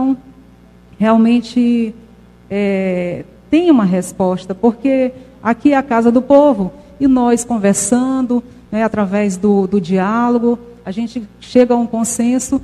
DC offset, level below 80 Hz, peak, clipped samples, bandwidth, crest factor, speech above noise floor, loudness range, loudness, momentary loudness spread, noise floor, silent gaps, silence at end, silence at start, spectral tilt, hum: under 0.1%; -46 dBFS; 0 dBFS; under 0.1%; 13.5 kHz; 14 dB; 30 dB; 3 LU; -15 LUFS; 11 LU; -43 dBFS; none; 0 s; 0 s; -6 dB/octave; 60 Hz at -40 dBFS